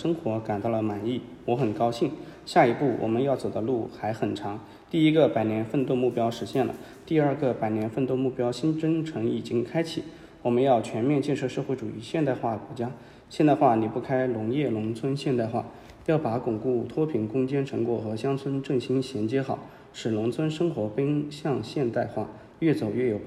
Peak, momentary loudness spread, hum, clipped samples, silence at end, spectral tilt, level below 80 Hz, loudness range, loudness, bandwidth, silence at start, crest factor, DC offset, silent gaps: -6 dBFS; 10 LU; none; under 0.1%; 0 s; -7.5 dB/octave; -62 dBFS; 3 LU; -27 LUFS; 12.5 kHz; 0 s; 20 dB; under 0.1%; none